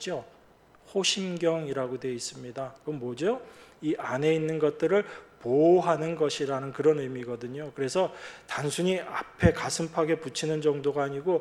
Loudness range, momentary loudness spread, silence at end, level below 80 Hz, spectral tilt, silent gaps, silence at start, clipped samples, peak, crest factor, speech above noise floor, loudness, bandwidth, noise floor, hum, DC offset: 5 LU; 11 LU; 0 s; -52 dBFS; -5 dB/octave; none; 0 s; under 0.1%; -6 dBFS; 22 dB; 30 dB; -28 LUFS; 13.5 kHz; -58 dBFS; none; under 0.1%